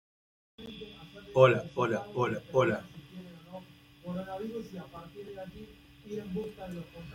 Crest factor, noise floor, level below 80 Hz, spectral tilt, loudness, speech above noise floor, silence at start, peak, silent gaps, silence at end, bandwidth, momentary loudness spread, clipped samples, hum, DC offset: 26 dB; -52 dBFS; -62 dBFS; -7 dB/octave; -31 LUFS; 20 dB; 0.6 s; -8 dBFS; none; 0 s; 15.5 kHz; 24 LU; under 0.1%; none; under 0.1%